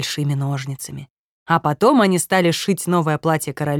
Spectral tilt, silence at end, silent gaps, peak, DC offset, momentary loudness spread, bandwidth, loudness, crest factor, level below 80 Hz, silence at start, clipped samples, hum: -5 dB/octave; 0 s; 1.10-1.46 s; -2 dBFS; under 0.1%; 13 LU; 18 kHz; -18 LUFS; 16 dB; -60 dBFS; 0 s; under 0.1%; none